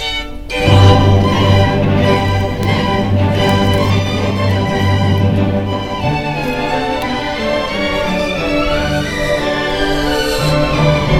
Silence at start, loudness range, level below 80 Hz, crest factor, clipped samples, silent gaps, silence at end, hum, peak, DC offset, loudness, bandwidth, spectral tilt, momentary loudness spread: 0 s; 4 LU; -26 dBFS; 14 dB; under 0.1%; none; 0 s; none; 0 dBFS; 1%; -14 LUFS; 14 kHz; -6 dB/octave; 6 LU